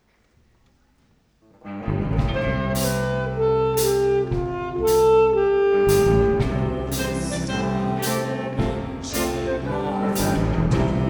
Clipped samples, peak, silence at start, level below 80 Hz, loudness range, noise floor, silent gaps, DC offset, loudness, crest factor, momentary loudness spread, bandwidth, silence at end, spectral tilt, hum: under 0.1%; -6 dBFS; 1.65 s; -34 dBFS; 6 LU; -61 dBFS; none; under 0.1%; -22 LUFS; 16 dB; 9 LU; over 20 kHz; 0 s; -6 dB/octave; none